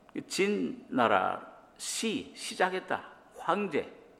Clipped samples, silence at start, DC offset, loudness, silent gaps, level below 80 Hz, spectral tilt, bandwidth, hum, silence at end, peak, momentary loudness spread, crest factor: under 0.1%; 0.15 s; under 0.1%; -32 LUFS; none; -74 dBFS; -3.5 dB/octave; 15.5 kHz; none; 0.2 s; -10 dBFS; 13 LU; 22 dB